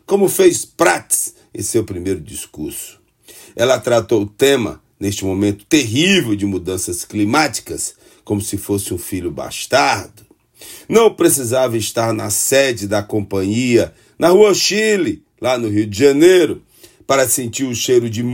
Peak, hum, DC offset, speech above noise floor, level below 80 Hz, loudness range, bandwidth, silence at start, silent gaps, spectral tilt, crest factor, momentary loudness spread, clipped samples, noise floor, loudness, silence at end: 0 dBFS; none; under 0.1%; 28 dB; -50 dBFS; 6 LU; 16.5 kHz; 0.1 s; none; -4 dB/octave; 16 dB; 13 LU; under 0.1%; -43 dBFS; -16 LUFS; 0 s